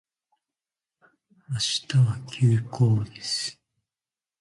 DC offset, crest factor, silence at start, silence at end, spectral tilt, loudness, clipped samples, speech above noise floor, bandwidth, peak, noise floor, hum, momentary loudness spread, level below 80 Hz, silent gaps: under 0.1%; 18 dB; 1.5 s; 0.9 s; -5 dB/octave; -25 LUFS; under 0.1%; over 66 dB; 11.5 kHz; -10 dBFS; under -90 dBFS; none; 6 LU; -58 dBFS; none